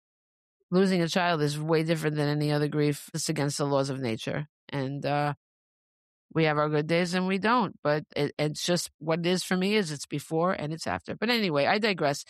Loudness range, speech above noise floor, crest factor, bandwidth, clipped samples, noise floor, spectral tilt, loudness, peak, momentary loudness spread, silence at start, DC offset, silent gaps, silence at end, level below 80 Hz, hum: 3 LU; over 63 dB; 16 dB; 14 kHz; under 0.1%; under -90 dBFS; -5 dB/octave; -28 LUFS; -12 dBFS; 8 LU; 0.7 s; under 0.1%; 4.49-4.68 s, 5.37-6.29 s, 7.79-7.83 s, 8.94-8.99 s; 0.05 s; -68 dBFS; none